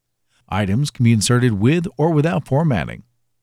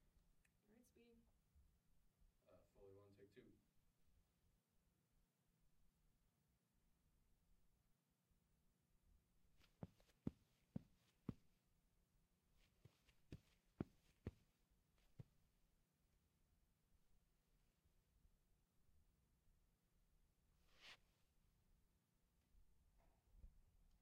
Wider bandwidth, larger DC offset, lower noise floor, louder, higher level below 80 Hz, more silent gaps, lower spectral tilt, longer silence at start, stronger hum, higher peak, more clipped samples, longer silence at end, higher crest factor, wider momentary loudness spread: first, 14.5 kHz vs 8.4 kHz; neither; second, -60 dBFS vs -86 dBFS; first, -18 LUFS vs -61 LUFS; first, -48 dBFS vs -78 dBFS; neither; about the same, -6 dB/octave vs -7 dB/octave; first, 0.5 s vs 0 s; neither; first, -2 dBFS vs -32 dBFS; neither; first, 0.45 s vs 0 s; second, 16 dB vs 36 dB; second, 9 LU vs 12 LU